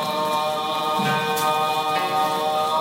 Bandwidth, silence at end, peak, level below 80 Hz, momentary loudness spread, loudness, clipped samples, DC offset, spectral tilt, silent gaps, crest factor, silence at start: 16 kHz; 0 s; -10 dBFS; -66 dBFS; 2 LU; -22 LUFS; under 0.1%; under 0.1%; -3.5 dB/octave; none; 12 dB; 0 s